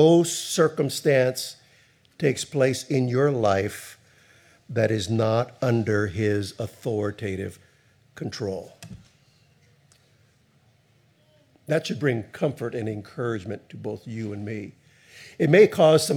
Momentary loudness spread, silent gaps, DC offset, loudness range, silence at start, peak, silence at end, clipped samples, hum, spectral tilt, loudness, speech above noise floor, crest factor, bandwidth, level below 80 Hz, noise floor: 16 LU; none; under 0.1%; 13 LU; 0 s; -4 dBFS; 0 s; under 0.1%; none; -5.5 dB/octave; -24 LUFS; 38 dB; 22 dB; 18.5 kHz; -66 dBFS; -62 dBFS